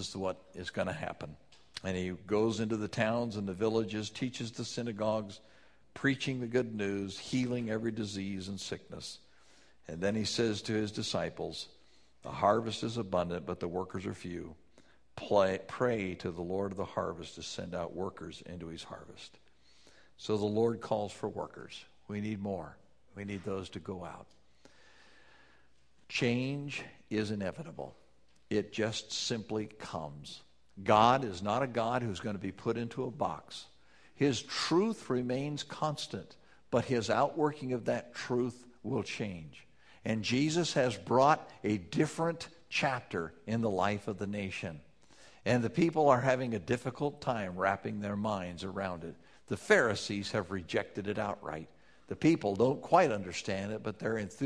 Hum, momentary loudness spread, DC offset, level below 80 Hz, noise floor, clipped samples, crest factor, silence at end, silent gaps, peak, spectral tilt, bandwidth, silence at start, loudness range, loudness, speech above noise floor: none; 16 LU; under 0.1%; -66 dBFS; -70 dBFS; under 0.1%; 24 dB; 0 s; none; -10 dBFS; -5.5 dB/octave; 11 kHz; 0 s; 7 LU; -34 LUFS; 36 dB